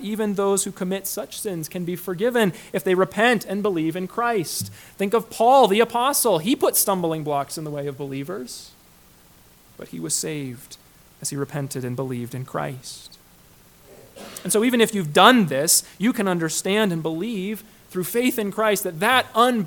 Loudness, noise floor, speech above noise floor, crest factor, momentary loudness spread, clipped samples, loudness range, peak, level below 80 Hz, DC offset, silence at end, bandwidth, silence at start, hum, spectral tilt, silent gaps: -21 LUFS; -52 dBFS; 30 dB; 22 dB; 14 LU; under 0.1%; 12 LU; 0 dBFS; -60 dBFS; under 0.1%; 0 s; 19 kHz; 0 s; none; -3.5 dB/octave; none